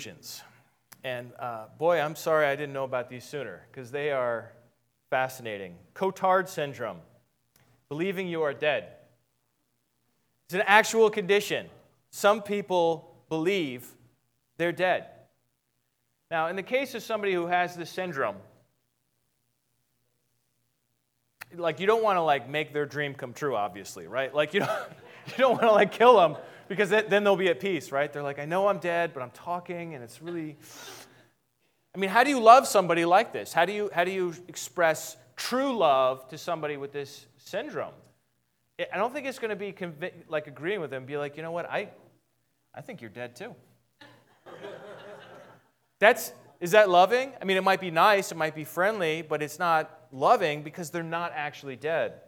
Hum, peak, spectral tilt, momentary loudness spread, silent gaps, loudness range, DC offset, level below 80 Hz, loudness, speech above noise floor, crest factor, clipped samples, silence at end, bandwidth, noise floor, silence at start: none; -2 dBFS; -4 dB/octave; 19 LU; none; 12 LU; under 0.1%; -80 dBFS; -26 LUFS; 50 dB; 26 dB; under 0.1%; 0.1 s; 18.5 kHz; -77 dBFS; 0 s